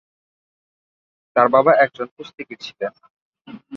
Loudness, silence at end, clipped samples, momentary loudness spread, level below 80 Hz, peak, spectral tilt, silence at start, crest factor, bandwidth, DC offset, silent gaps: -17 LUFS; 0 s; under 0.1%; 20 LU; -70 dBFS; -2 dBFS; -6 dB/octave; 1.35 s; 20 dB; 6.8 kHz; under 0.1%; 2.11-2.17 s, 3.10-3.33 s